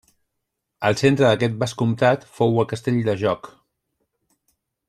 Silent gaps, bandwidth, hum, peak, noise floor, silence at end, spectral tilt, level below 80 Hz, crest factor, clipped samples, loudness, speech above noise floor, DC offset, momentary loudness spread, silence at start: none; 13 kHz; none; -4 dBFS; -79 dBFS; 1.4 s; -6.5 dB/octave; -58 dBFS; 18 dB; under 0.1%; -20 LUFS; 59 dB; under 0.1%; 6 LU; 0.8 s